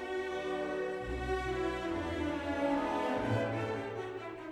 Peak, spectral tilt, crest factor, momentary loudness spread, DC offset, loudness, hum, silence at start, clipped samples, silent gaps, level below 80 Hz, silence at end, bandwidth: -22 dBFS; -6.5 dB/octave; 14 dB; 6 LU; under 0.1%; -36 LUFS; none; 0 s; under 0.1%; none; -50 dBFS; 0 s; 13.5 kHz